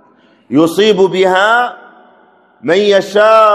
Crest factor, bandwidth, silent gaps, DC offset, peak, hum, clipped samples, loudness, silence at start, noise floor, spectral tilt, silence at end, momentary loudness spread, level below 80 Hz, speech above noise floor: 12 dB; 14 kHz; none; under 0.1%; 0 dBFS; none; 0.5%; -10 LUFS; 0.5 s; -47 dBFS; -4.5 dB/octave; 0 s; 7 LU; -58 dBFS; 38 dB